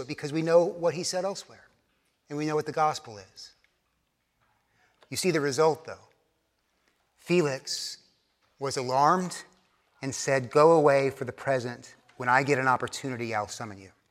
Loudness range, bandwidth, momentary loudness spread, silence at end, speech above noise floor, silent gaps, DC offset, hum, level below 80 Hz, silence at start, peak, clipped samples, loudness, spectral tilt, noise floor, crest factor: 8 LU; 15 kHz; 18 LU; 0.2 s; 49 dB; none; under 0.1%; none; -74 dBFS; 0 s; -6 dBFS; under 0.1%; -27 LUFS; -4.5 dB/octave; -75 dBFS; 22 dB